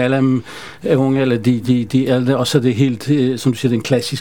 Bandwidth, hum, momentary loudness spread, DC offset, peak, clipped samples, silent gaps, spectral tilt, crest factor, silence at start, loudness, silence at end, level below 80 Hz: 17 kHz; none; 3 LU; 0.7%; 0 dBFS; under 0.1%; none; -6.5 dB/octave; 16 dB; 0 s; -16 LUFS; 0 s; -52 dBFS